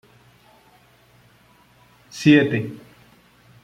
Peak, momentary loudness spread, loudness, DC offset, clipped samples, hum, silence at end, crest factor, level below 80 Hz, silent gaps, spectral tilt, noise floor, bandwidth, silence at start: -2 dBFS; 25 LU; -18 LUFS; under 0.1%; under 0.1%; none; 0.85 s; 22 dB; -60 dBFS; none; -6.5 dB/octave; -55 dBFS; 10 kHz; 2.15 s